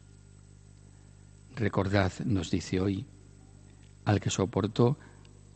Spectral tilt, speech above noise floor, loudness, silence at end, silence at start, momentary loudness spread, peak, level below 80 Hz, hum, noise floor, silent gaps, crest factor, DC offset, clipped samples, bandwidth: -6 dB/octave; 25 dB; -30 LUFS; 0.45 s; 1.5 s; 10 LU; -8 dBFS; -58 dBFS; 50 Hz at -50 dBFS; -54 dBFS; none; 22 dB; under 0.1%; under 0.1%; 8.8 kHz